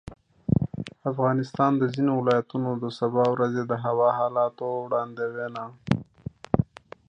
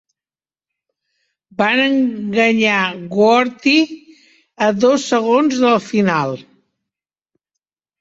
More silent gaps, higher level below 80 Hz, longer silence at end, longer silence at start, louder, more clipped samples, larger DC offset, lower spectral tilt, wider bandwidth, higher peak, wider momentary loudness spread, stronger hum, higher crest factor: neither; first, -50 dBFS vs -60 dBFS; second, 0.45 s vs 1.6 s; second, 0.05 s vs 1.6 s; second, -26 LUFS vs -15 LUFS; neither; neither; first, -8.5 dB/octave vs -4.5 dB/octave; first, 9.2 kHz vs 8 kHz; about the same, -4 dBFS vs -2 dBFS; first, 10 LU vs 7 LU; neither; first, 22 dB vs 14 dB